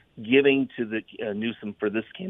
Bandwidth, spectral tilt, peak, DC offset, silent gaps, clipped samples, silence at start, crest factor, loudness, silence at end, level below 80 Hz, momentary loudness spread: 3.9 kHz; -8.5 dB/octave; -6 dBFS; under 0.1%; none; under 0.1%; 0.15 s; 20 dB; -25 LUFS; 0 s; -68 dBFS; 12 LU